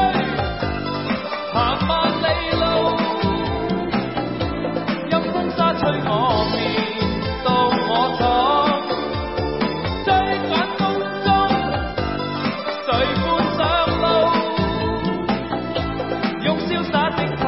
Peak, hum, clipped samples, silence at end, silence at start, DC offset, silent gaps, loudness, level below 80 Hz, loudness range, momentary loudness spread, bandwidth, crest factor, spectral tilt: -4 dBFS; none; under 0.1%; 0 s; 0 s; 0.3%; none; -20 LUFS; -36 dBFS; 2 LU; 6 LU; 5.8 kHz; 16 dB; -10 dB/octave